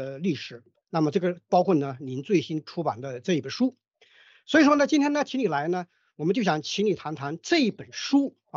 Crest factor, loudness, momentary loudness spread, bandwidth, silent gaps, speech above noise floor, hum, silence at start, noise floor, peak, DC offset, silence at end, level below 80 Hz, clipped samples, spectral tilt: 18 dB; -26 LUFS; 12 LU; 7.6 kHz; none; 33 dB; none; 0 s; -58 dBFS; -8 dBFS; under 0.1%; 0 s; -72 dBFS; under 0.1%; -5.5 dB/octave